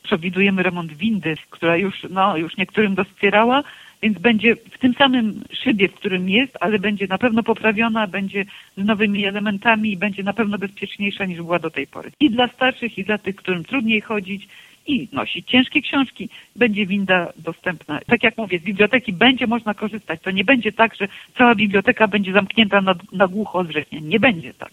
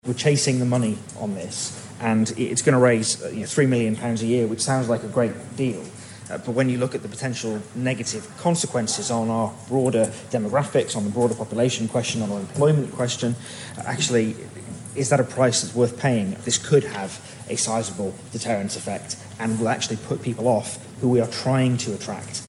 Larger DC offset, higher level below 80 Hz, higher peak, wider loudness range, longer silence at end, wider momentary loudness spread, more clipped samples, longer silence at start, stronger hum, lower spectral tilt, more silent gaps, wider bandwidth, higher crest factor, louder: neither; first, -56 dBFS vs -62 dBFS; first, 0 dBFS vs -4 dBFS; about the same, 4 LU vs 4 LU; about the same, 0.05 s vs 0 s; about the same, 10 LU vs 11 LU; neither; about the same, 0.05 s vs 0.05 s; neither; first, -6.5 dB/octave vs -5 dB/octave; neither; about the same, 12.5 kHz vs 11.5 kHz; about the same, 20 dB vs 18 dB; first, -19 LUFS vs -23 LUFS